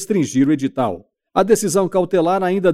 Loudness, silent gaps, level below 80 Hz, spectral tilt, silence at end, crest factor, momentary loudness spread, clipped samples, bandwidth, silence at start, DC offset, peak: -17 LUFS; none; -54 dBFS; -5.5 dB/octave; 0 s; 16 dB; 7 LU; under 0.1%; 15 kHz; 0 s; under 0.1%; -2 dBFS